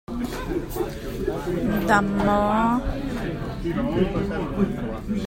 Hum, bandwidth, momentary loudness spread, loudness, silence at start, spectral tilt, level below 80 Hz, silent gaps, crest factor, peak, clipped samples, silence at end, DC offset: none; 16.5 kHz; 9 LU; -24 LUFS; 0.1 s; -7 dB/octave; -36 dBFS; none; 20 dB; -2 dBFS; under 0.1%; 0 s; under 0.1%